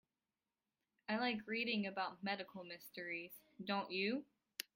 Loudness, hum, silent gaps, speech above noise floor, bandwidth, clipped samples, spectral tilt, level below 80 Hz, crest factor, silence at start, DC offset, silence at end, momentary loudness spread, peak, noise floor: -43 LUFS; none; none; over 47 dB; 16.5 kHz; under 0.1%; -4.5 dB/octave; -86 dBFS; 24 dB; 1.1 s; under 0.1%; 0.15 s; 12 LU; -20 dBFS; under -90 dBFS